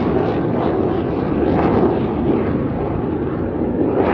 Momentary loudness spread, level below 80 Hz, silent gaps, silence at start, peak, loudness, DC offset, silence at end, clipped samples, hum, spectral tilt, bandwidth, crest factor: 5 LU; -34 dBFS; none; 0 s; -2 dBFS; -19 LUFS; under 0.1%; 0 s; under 0.1%; none; -10.5 dB/octave; 5.8 kHz; 16 dB